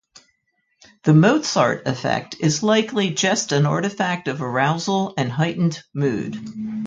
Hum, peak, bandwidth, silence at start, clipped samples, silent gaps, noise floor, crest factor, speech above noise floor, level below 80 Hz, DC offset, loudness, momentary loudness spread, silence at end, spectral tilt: none; -2 dBFS; 9 kHz; 1.05 s; under 0.1%; none; -69 dBFS; 18 dB; 50 dB; -60 dBFS; under 0.1%; -20 LUFS; 8 LU; 0 s; -5 dB/octave